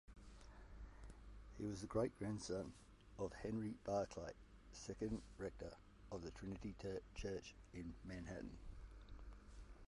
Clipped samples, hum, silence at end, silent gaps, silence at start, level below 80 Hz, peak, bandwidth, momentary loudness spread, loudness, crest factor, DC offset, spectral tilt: under 0.1%; none; 0.05 s; none; 0.1 s; -60 dBFS; -28 dBFS; 11.5 kHz; 18 LU; -49 LUFS; 22 dB; under 0.1%; -6 dB/octave